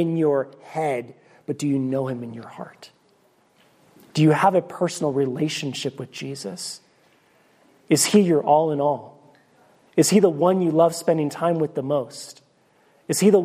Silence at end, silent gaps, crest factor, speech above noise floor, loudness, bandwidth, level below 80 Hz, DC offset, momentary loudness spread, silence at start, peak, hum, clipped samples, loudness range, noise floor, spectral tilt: 0 s; none; 18 dB; 40 dB; -22 LUFS; 15.5 kHz; -70 dBFS; under 0.1%; 19 LU; 0 s; -4 dBFS; none; under 0.1%; 8 LU; -61 dBFS; -5 dB/octave